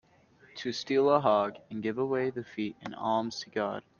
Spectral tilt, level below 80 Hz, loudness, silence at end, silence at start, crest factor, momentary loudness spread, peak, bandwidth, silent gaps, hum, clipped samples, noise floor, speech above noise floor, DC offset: -5.5 dB/octave; -72 dBFS; -30 LUFS; 0.2 s; 0.55 s; 20 dB; 12 LU; -10 dBFS; 7.2 kHz; none; none; under 0.1%; -61 dBFS; 31 dB; under 0.1%